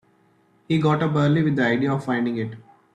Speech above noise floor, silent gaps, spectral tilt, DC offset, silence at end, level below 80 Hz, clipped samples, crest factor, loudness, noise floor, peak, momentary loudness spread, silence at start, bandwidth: 39 dB; none; -8 dB/octave; under 0.1%; 0.35 s; -60 dBFS; under 0.1%; 14 dB; -22 LUFS; -60 dBFS; -8 dBFS; 7 LU; 0.7 s; 9 kHz